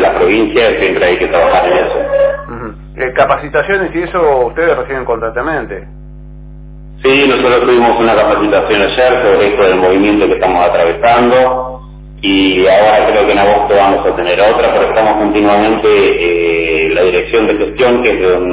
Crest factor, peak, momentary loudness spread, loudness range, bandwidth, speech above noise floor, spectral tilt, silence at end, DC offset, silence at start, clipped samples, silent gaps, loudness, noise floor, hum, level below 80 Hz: 10 dB; 0 dBFS; 8 LU; 4 LU; 4 kHz; 20 dB; -9 dB/octave; 0 s; under 0.1%; 0 s; under 0.1%; none; -10 LUFS; -30 dBFS; none; -32 dBFS